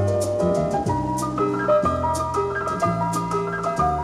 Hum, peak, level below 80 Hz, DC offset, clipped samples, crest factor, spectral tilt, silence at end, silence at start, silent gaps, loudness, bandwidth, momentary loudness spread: none; -8 dBFS; -42 dBFS; under 0.1%; under 0.1%; 14 dB; -6.5 dB/octave; 0 s; 0 s; none; -22 LUFS; 14.5 kHz; 4 LU